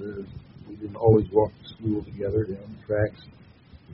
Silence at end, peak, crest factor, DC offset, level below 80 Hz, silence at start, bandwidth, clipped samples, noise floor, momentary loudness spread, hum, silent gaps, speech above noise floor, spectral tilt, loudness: 0 s; -6 dBFS; 20 dB; under 0.1%; -48 dBFS; 0 s; 5.6 kHz; under 0.1%; -50 dBFS; 19 LU; none; none; 26 dB; -8 dB/octave; -25 LUFS